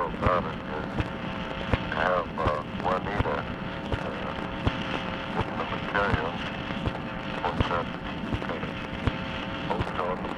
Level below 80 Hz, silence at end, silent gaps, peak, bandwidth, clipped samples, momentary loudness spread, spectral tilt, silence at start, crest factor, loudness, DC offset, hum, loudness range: -42 dBFS; 0 s; none; -10 dBFS; 11.5 kHz; under 0.1%; 7 LU; -7 dB/octave; 0 s; 20 dB; -30 LUFS; under 0.1%; none; 2 LU